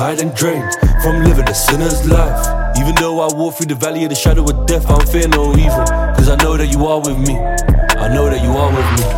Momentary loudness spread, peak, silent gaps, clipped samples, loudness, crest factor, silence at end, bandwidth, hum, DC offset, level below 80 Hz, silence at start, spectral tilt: 4 LU; 0 dBFS; none; under 0.1%; -14 LUFS; 12 dB; 0 s; 17 kHz; none; under 0.1%; -14 dBFS; 0 s; -5 dB/octave